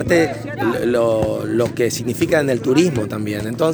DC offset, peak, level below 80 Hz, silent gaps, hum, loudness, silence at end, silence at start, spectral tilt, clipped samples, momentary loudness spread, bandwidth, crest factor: under 0.1%; -2 dBFS; -46 dBFS; none; none; -18 LUFS; 0 s; 0 s; -5.5 dB/octave; under 0.1%; 6 LU; over 20 kHz; 16 dB